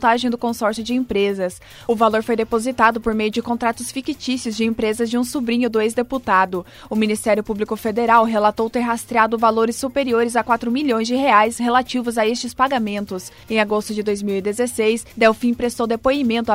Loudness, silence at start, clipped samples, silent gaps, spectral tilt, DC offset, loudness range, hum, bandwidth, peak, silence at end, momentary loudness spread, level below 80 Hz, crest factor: -19 LUFS; 0 s; under 0.1%; none; -4 dB/octave; under 0.1%; 3 LU; none; 16 kHz; 0 dBFS; 0 s; 7 LU; -48 dBFS; 18 dB